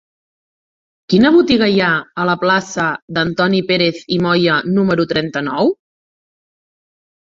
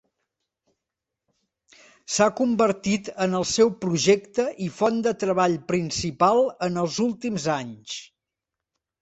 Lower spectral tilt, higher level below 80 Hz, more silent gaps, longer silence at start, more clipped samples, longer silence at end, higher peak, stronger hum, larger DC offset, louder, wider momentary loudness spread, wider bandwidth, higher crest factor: first, -6 dB/octave vs -4.5 dB/octave; first, -52 dBFS vs -60 dBFS; first, 3.02-3.08 s vs none; second, 1.1 s vs 2.1 s; neither; first, 1.65 s vs 0.95 s; about the same, -2 dBFS vs -4 dBFS; neither; neither; first, -15 LUFS vs -23 LUFS; about the same, 8 LU vs 8 LU; about the same, 7.6 kHz vs 8.2 kHz; about the same, 16 dB vs 20 dB